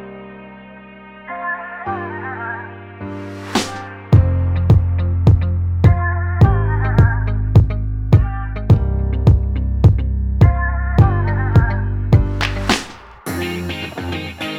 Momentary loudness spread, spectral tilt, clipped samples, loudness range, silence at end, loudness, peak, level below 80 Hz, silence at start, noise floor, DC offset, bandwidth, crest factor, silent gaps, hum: 15 LU; -7 dB/octave; under 0.1%; 8 LU; 0 s; -17 LUFS; 0 dBFS; -22 dBFS; 0 s; -38 dBFS; under 0.1%; 12.5 kHz; 16 dB; none; none